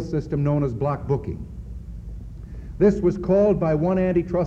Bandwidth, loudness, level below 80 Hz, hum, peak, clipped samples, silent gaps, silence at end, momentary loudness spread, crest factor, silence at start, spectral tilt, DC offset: 7.8 kHz; -22 LUFS; -38 dBFS; none; -6 dBFS; under 0.1%; none; 0 s; 19 LU; 16 dB; 0 s; -10 dB/octave; under 0.1%